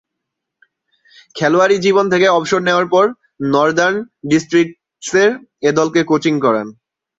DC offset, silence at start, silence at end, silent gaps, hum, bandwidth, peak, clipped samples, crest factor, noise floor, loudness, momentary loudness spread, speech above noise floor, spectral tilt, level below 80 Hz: under 0.1%; 1.35 s; 0.45 s; none; none; 8 kHz; 0 dBFS; under 0.1%; 14 dB; -78 dBFS; -15 LUFS; 9 LU; 64 dB; -5 dB/octave; -58 dBFS